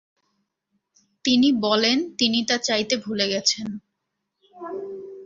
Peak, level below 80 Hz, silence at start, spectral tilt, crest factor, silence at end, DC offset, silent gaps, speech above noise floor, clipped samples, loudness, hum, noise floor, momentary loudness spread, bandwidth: -4 dBFS; -66 dBFS; 1.25 s; -2.5 dB/octave; 20 dB; 0 s; under 0.1%; none; 58 dB; under 0.1%; -21 LUFS; none; -79 dBFS; 16 LU; 7.6 kHz